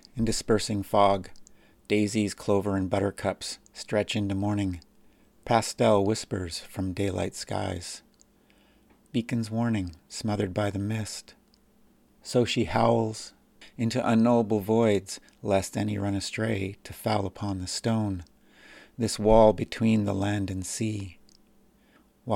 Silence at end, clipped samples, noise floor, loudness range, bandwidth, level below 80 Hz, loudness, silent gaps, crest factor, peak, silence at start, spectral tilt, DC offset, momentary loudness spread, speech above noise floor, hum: 0 s; under 0.1%; -61 dBFS; 6 LU; 16 kHz; -48 dBFS; -27 LUFS; none; 22 dB; -6 dBFS; 0.15 s; -5.5 dB/octave; under 0.1%; 14 LU; 35 dB; none